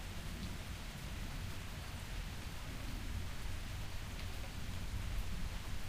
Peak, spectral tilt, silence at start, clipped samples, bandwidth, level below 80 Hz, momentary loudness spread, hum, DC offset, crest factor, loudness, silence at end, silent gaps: -28 dBFS; -4.5 dB/octave; 0 s; under 0.1%; 15.5 kHz; -46 dBFS; 3 LU; none; under 0.1%; 14 dB; -46 LUFS; 0 s; none